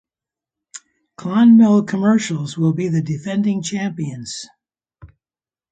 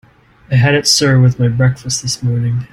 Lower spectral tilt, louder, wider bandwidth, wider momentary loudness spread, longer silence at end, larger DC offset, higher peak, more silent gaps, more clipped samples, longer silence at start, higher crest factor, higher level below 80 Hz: first, -6.5 dB/octave vs -4.5 dB/octave; second, -17 LUFS vs -13 LUFS; second, 9.2 kHz vs 13.5 kHz; first, 27 LU vs 7 LU; first, 0.65 s vs 0.05 s; neither; second, -4 dBFS vs 0 dBFS; neither; neither; first, 0.75 s vs 0.5 s; about the same, 14 dB vs 14 dB; second, -60 dBFS vs -44 dBFS